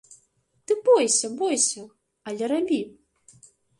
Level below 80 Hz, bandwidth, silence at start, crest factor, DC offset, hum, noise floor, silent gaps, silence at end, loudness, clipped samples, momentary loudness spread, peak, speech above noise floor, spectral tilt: -72 dBFS; 11.5 kHz; 0.7 s; 18 dB; under 0.1%; none; -66 dBFS; none; 0.9 s; -23 LUFS; under 0.1%; 18 LU; -8 dBFS; 43 dB; -2 dB/octave